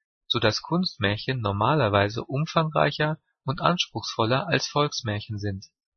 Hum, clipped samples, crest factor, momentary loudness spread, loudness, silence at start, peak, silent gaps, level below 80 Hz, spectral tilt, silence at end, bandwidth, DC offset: none; under 0.1%; 22 dB; 9 LU; -25 LUFS; 0.3 s; -4 dBFS; none; -56 dBFS; -5 dB/octave; 0.3 s; 6.6 kHz; under 0.1%